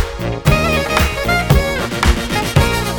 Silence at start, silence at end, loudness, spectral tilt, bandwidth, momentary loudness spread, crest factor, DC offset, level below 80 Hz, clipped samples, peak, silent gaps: 0 s; 0 s; -15 LUFS; -5 dB/octave; over 20 kHz; 4 LU; 16 dB; 0.5%; -22 dBFS; under 0.1%; 0 dBFS; none